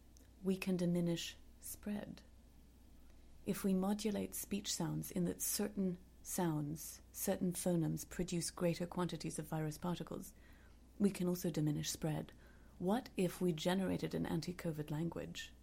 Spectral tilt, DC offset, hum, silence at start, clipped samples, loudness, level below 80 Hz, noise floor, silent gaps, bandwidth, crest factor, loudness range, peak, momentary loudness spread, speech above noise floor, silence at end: -5.5 dB/octave; under 0.1%; none; 0.05 s; under 0.1%; -40 LUFS; -62 dBFS; -62 dBFS; none; 16.5 kHz; 18 dB; 3 LU; -22 dBFS; 11 LU; 22 dB; 0.05 s